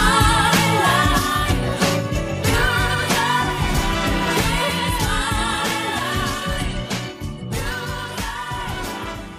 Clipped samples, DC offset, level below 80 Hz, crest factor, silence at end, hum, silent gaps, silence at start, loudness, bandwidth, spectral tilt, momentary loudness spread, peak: under 0.1%; under 0.1%; -30 dBFS; 16 dB; 0 s; none; none; 0 s; -20 LUFS; 15.5 kHz; -4 dB/octave; 11 LU; -4 dBFS